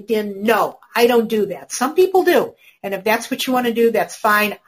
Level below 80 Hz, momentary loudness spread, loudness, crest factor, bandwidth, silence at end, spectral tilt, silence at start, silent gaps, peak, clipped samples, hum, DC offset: -62 dBFS; 8 LU; -17 LUFS; 16 dB; 15.5 kHz; 0.1 s; -3.5 dB/octave; 0.1 s; none; -2 dBFS; under 0.1%; none; under 0.1%